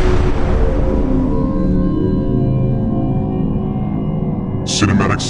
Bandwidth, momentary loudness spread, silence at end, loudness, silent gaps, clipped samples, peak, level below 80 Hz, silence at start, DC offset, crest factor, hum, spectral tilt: 10.5 kHz; 5 LU; 0 s; -17 LUFS; none; under 0.1%; 0 dBFS; -20 dBFS; 0 s; under 0.1%; 14 dB; none; -6.5 dB/octave